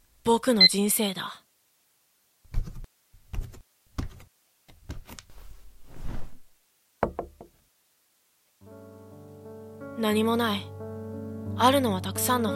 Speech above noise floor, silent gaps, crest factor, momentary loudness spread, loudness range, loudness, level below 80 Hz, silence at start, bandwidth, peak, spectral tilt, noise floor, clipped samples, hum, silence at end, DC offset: 45 dB; none; 24 dB; 25 LU; 19 LU; -24 LUFS; -44 dBFS; 0.25 s; 16 kHz; -6 dBFS; -3.5 dB/octave; -68 dBFS; under 0.1%; none; 0 s; under 0.1%